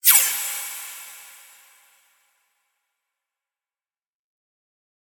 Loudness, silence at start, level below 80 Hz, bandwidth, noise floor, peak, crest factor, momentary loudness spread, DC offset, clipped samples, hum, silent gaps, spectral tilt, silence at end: -20 LUFS; 0.05 s; -84 dBFS; 19.5 kHz; under -90 dBFS; 0 dBFS; 28 dB; 26 LU; under 0.1%; under 0.1%; none; none; 5 dB/octave; 3.75 s